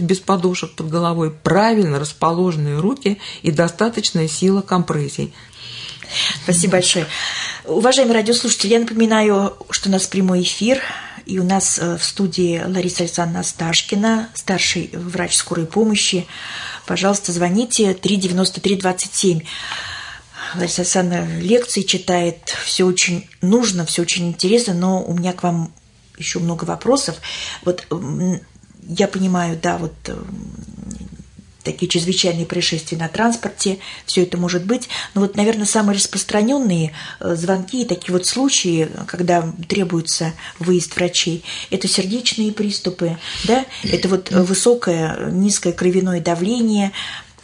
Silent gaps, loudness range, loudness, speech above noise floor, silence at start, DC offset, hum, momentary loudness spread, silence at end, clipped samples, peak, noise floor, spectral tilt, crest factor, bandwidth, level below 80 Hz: none; 5 LU; -18 LUFS; 23 dB; 0 s; under 0.1%; none; 10 LU; 0.2 s; under 0.1%; -2 dBFS; -41 dBFS; -4 dB/octave; 16 dB; 11 kHz; -50 dBFS